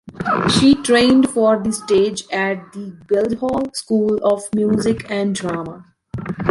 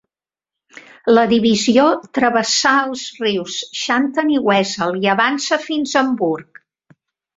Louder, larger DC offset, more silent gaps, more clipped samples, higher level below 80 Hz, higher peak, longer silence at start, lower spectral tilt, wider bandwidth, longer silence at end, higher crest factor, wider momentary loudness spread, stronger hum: about the same, -17 LUFS vs -16 LUFS; neither; neither; neither; first, -46 dBFS vs -60 dBFS; about the same, -2 dBFS vs 0 dBFS; second, 0.05 s vs 0.75 s; first, -5 dB/octave vs -3.5 dB/octave; first, 11.5 kHz vs 7.8 kHz; second, 0 s vs 0.95 s; about the same, 16 dB vs 16 dB; first, 14 LU vs 8 LU; neither